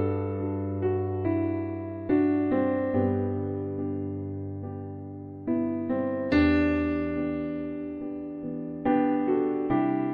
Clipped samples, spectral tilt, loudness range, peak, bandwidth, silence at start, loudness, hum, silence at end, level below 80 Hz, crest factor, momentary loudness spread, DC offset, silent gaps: under 0.1%; -10 dB/octave; 3 LU; -12 dBFS; 5.2 kHz; 0 s; -28 LUFS; none; 0 s; -50 dBFS; 16 dB; 11 LU; under 0.1%; none